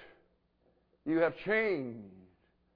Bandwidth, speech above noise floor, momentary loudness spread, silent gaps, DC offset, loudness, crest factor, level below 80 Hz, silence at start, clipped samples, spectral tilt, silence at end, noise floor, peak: 5.2 kHz; 40 dB; 14 LU; none; under 0.1%; -32 LUFS; 18 dB; -70 dBFS; 0 s; under 0.1%; -4.5 dB/octave; 0.55 s; -72 dBFS; -18 dBFS